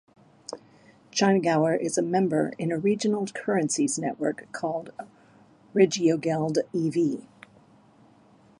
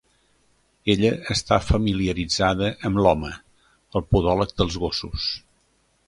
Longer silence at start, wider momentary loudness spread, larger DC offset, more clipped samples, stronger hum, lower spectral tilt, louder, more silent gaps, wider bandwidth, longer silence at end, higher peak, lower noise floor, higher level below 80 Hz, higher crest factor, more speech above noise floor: second, 0.5 s vs 0.85 s; first, 18 LU vs 9 LU; neither; neither; neither; about the same, -5 dB/octave vs -5.5 dB/octave; about the same, -25 LUFS vs -23 LUFS; neither; about the same, 11.5 kHz vs 11.5 kHz; first, 1.4 s vs 0.7 s; second, -8 dBFS vs -2 dBFS; second, -57 dBFS vs -65 dBFS; second, -74 dBFS vs -36 dBFS; about the same, 20 dB vs 20 dB; second, 32 dB vs 43 dB